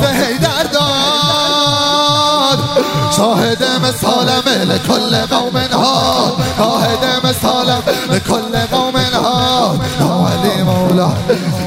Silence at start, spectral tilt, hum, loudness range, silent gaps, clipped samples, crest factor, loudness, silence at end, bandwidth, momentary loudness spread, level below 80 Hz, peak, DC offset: 0 s; -4.5 dB/octave; none; 2 LU; none; under 0.1%; 12 dB; -12 LUFS; 0 s; 16 kHz; 4 LU; -40 dBFS; 0 dBFS; under 0.1%